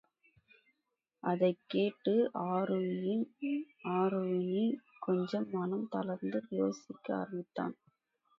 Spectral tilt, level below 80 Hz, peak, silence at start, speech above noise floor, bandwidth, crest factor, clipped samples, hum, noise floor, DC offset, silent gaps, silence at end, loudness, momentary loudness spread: -8 dB/octave; -82 dBFS; -18 dBFS; 1.25 s; 52 dB; 7.2 kHz; 16 dB; under 0.1%; none; -86 dBFS; under 0.1%; none; 0.65 s; -35 LUFS; 8 LU